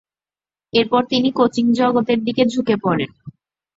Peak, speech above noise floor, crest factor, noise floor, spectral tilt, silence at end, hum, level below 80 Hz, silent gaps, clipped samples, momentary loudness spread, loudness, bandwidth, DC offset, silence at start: -2 dBFS; over 73 dB; 16 dB; under -90 dBFS; -6 dB/octave; 0.5 s; none; -58 dBFS; none; under 0.1%; 4 LU; -18 LUFS; 7.8 kHz; under 0.1%; 0.75 s